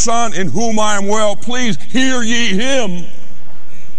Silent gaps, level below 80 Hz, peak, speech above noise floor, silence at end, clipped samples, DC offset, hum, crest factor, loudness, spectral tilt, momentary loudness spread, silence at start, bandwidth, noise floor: none; -44 dBFS; 0 dBFS; 22 dB; 0 s; under 0.1%; 40%; none; 14 dB; -16 LUFS; -3.5 dB/octave; 4 LU; 0 s; 12.5 kHz; -38 dBFS